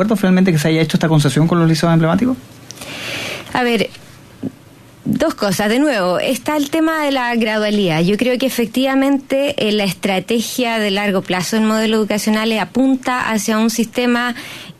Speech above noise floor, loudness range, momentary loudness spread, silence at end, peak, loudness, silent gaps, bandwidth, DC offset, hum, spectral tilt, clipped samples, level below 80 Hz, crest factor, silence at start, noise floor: 27 dB; 3 LU; 9 LU; 0.1 s; -2 dBFS; -16 LUFS; none; 14 kHz; under 0.1%; none; -5 dB/octave; under 0.1%; -50 dBFS; 14 dB; 0 s; -42 dBFS